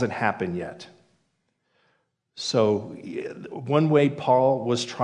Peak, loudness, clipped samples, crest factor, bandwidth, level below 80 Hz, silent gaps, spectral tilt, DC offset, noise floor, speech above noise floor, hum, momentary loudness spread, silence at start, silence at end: -6 dBFS; -24 LUFS; under 0.1%; 18 dB; 10.5 kHz; -72 dBFS; none; -6 dB/octave; under 0.1%; -73 dBFS; 50 dB; none; 15 LU; 0 s; 0 s